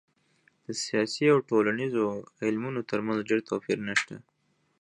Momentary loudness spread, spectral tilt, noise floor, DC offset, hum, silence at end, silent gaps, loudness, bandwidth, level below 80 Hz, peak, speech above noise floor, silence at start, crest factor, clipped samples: 11 LU; -5 dB/octave; -72 dBFS; under 0.1%; none; 0.65 s; none; -28 LUFS; 11 kHz; -72 dBFS; -10 dBFS; 44 dB; 0.7 s; 20 dB; under 0.1%